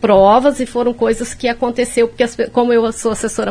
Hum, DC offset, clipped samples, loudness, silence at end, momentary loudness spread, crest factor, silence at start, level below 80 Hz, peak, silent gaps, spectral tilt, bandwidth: none; under 0.1%; under 0.1%; -15 LUFS; 0 s; 8 LU; 14 dB; 0 s; -40 dBFS; 0 dBFS; none; -4.5 dB/octave; 11 kHz